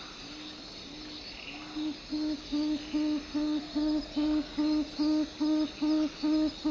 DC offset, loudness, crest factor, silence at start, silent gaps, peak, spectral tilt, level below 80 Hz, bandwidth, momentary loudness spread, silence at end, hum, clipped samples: under 0.1%; -32 LUFS; 12 dB; 0 s; none; -20 dBFS; -4.5 dB/octave; -54 dBFS; 7.6 kHz; 13 LU; 0 s; none; under 0.1%